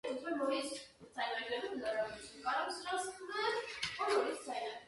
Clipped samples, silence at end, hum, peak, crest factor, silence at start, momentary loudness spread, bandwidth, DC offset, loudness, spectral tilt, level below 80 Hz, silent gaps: under 0.1%; 0 s; none; -22 dBFS; 18 dB; 0.05 s; 8 LU; 11.5 kHz; under 0.1%; -39 LUFS; -2 dB/octave; -74 dBFS; none